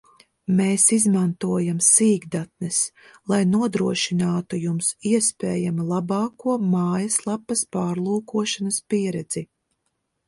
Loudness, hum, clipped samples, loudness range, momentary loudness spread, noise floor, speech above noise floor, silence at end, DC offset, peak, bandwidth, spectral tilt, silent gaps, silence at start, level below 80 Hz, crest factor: -21 LUFS; none; under 0.1%; 4 LU; 10 LU; -75 dBFS; 53 dB; 0.85 s; under 0.1%; -2 dBFS; 11.5 kHz; -4.5 dB/octave; none; 0.5 s; -64 dBFS; 20 dB